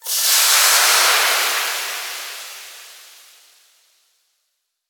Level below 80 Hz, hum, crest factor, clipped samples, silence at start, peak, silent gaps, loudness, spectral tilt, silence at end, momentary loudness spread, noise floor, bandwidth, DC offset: under -90 dBFS; none; 18 dB; under 0.1%; 0.05 s; -2 dBFS; none; -14 LUFS; 8 dB/octave; 1.9 s; 21 LU; -73 dBFS; over 20 kHz; under 0.1%